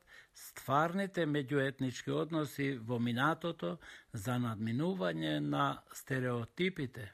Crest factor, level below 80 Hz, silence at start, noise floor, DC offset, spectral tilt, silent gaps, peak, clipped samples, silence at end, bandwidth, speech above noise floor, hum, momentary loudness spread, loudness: 18 dB; -70 dBFS; 0.1 s; -56 dBFS; under 0.1%; -6 dB/octave; none; -18 dBFS; under 0.1%; 0 s; 15.5 kHz; 20 dB; none; 10 LU; -36 LUFS